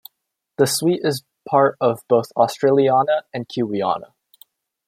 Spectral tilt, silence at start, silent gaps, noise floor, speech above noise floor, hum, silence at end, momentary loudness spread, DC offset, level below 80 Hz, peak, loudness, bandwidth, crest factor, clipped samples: -5 dB/octave; 0.6 s; none; -73 dBFS; 55 dB; none; 0.85 s; 9 LU; under 0.1%; -68 dBFS; -2 dBFS; -19 LUFS; 16.5 kHz; 18 dB; under 0.1%